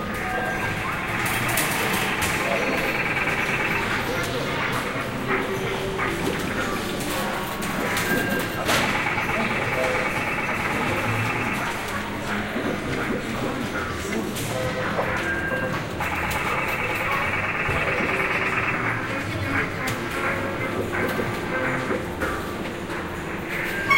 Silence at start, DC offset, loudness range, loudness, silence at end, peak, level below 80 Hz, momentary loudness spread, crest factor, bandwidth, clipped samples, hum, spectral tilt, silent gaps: 0 s; under 0.1%; 3 LU; -24 LUFS; 0 s; -6 dBFS; -42 dBFS; 5 LU; 18 dB; 16 kHz; under 0.1%; none; -4 dB/octave; none